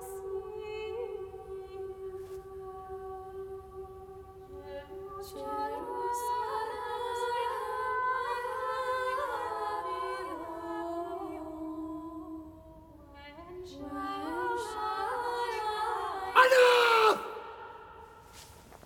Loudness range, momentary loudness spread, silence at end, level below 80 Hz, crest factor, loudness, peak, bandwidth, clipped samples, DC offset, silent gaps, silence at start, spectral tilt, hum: 16 LU; 20 LU; 0 s; -60 dBFS; 26 dB; -32 LUFS; -8 dBFS; 17.5 kHz; under 0.1%; under 0.1%; none; 0 s; -3 dB/octave; none